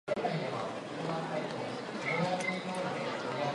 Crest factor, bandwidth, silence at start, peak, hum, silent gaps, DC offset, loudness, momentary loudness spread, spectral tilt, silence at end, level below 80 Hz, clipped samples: 16 dB; 11.5 kHz; 0.05 s; -20 dBFS; none; none; under 0.1%; -35 LUFS; 6 LU; -5 dB/octave; 0 s; -74 dBFS; under 0.1%